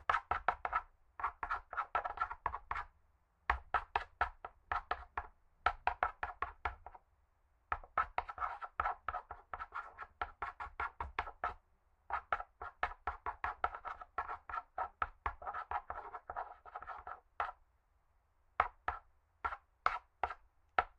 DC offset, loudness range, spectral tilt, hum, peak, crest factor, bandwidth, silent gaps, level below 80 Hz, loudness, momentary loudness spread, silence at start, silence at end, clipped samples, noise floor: under 0.1%; 4 LU; -5 dB/octave; none; -14 dBFS; 28 dB; 9.4 kHz; none; -58 dBFS; -42 LUFS; 10 LU; 0 s; 0.1 s; under 0.1%; -74 dBFS